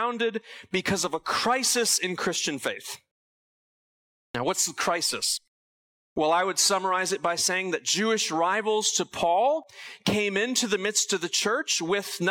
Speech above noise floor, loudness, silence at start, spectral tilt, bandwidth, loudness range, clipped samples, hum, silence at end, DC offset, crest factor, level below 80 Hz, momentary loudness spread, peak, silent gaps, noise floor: over 64 dB; -25 LUFS; 0 s; -2 dB/octave; 18 kHz; 5 LU; under 0.1%; none; 0 s; under 0.1%; 16 dB; -66 dBFS; 9 LU; -12 dBFS; 3.11-4.34 s, 5.48-6.16 s; under -90 dBFS